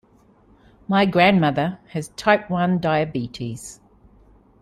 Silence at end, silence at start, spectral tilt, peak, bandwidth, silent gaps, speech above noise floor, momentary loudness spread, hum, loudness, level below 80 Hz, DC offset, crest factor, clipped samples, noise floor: 0.9 s; 0.9 s; -6 dB/octave; -2 dBFS; 12.5 kHz; none; 35 dB; 16 LU; none; -20 LUFS; -54 dBFS; under 0.1%; 20 dB; under 0.1%; -55 dBFS